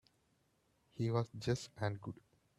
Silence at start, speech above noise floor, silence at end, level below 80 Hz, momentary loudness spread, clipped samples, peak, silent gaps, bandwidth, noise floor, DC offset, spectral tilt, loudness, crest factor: 0.95 s; 38 dB; 0.45 s; -70 dBFS; 16 LU; under 0.1%; -22 dBFS; none; 11.5 kHz; -77 dBFS; under 0.1%; -6.5 dB/octave; -40 LUFS; 20 dB